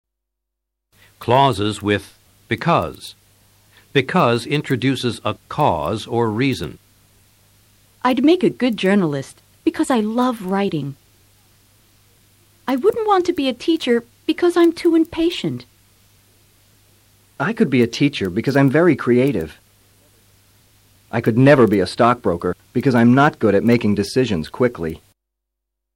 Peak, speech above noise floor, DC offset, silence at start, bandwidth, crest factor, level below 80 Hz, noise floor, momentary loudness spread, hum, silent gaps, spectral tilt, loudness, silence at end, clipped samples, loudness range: -2 dBFS; 63 dB; under 0.1%; 1.2 s; 16.5 kHz; 16 dB; -52 dBFS; -80 dBFS; 12 LU; none; none; -6.5 dB/octave; -18 LUFS; 1 s; under 0.1%; 6 LU